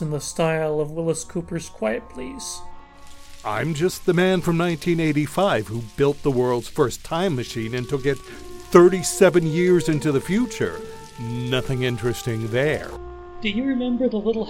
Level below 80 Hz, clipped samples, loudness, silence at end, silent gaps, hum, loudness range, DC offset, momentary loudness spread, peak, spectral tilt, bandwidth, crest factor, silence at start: -44 dBFS; under 0.1%; -22 LUFS; 0 s; none; none; 7 LU; under 0.1%; 14 LU; 0 dBFS; -5.5 dB/octave; 16.5 kHz; 22 dB; 0 s